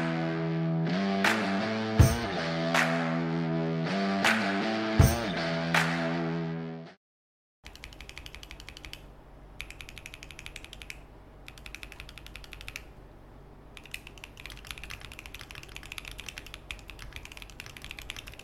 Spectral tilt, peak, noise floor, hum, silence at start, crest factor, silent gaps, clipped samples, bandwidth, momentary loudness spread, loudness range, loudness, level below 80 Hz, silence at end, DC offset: -5.5 dB/octave; -10 dBFS; -50 dBFS; none; 0 s; 22 dB; 6.97-7.63 s; under 0.1%; 16.5 kHz; 20 LU; 18 LU; -29 LUFS; -44 dBFS; 0 s; under 0.1%